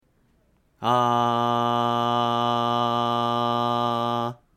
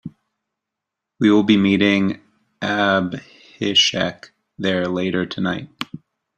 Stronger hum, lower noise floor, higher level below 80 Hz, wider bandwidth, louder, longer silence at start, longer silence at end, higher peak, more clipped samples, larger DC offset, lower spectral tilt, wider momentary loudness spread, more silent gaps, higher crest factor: neither; second, -64 dBFS vs -83 dBFS; second, -66 dBFS vs -58 dBFS; first, 15.5 kHz vs 8.6 kHz; second, -23 LUFS vs -19 LUFS; first, 0.8 s vs 0.05 s; second, 0.2 s vs 0.4 s; second, -8 dBFS vs -2 dBFS; neither; neither; first, -6 dB/octave vs -4.5 dB/octave; second, 3 LU vs 17 LU; neither; about the same, 16 dB vs 18 dB